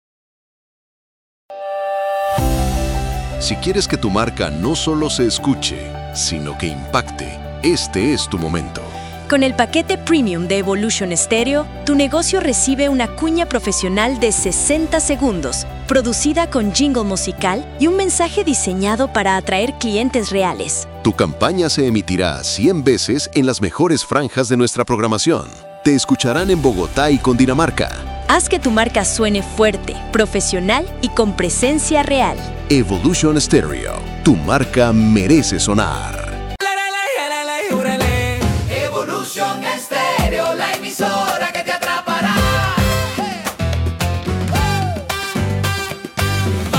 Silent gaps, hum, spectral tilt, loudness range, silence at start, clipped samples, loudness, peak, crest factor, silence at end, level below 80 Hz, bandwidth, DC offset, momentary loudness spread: none; none; -4 dB/octave; 4 LU; 1.5 s; under 0.1%; -17 LUFS; -2 dBFS; 16 dB; 0 s; -30 dBFS; 17 kHz; under 0.1%; 7 LU